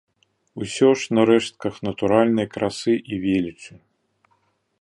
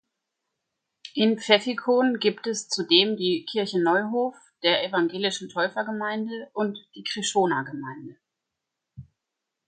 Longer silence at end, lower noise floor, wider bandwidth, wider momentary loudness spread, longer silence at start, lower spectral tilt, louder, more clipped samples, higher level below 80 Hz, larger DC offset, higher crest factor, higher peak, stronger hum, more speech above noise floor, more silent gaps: first, 1.1 s vs 0.65 s; second, -67 dBFS vs -84 dBFS; first, 11.5 kHz vs 9.6 kHz; about the same, 12 LU vs 12 LU; second, 0.55 s vs 1.05 s; first, -5.5 dB/octave vs -3.5 dB/octave; first, -21 LUFS vs -24 LUFS; neither; first, -56 dBFS vs -72 dBFS; neither; about the same, 20 dB vs 22 dB; about the same, -2 dBFS vs -4 dBFS; neither; second, 46 dB vs 60 dB; neither